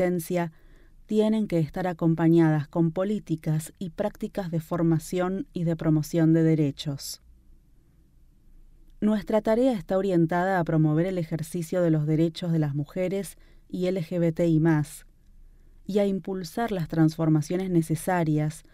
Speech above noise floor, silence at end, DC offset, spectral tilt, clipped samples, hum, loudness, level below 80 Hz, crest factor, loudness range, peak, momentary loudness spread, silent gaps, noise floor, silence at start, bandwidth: 33 dB; 0.15 s; under 0.1%; -7.5 dB/octave; under 0.1%; none; -26 LUFS; -52 dBFS; 16 dB; 3 LU; -10 dBFS; 9 LU; none; -57 dBFS; 0 s; 15 kHz